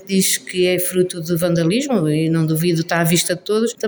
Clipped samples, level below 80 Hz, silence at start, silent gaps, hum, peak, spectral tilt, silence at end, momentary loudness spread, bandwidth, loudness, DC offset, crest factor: under 0.1%; -56 dBFS; 0 s; none; none; -4 dBFS; -4.5 dB/octave; 0 s; 3 LU; over 20 kHz; -17 LUFS; under 0.1%; 14 dB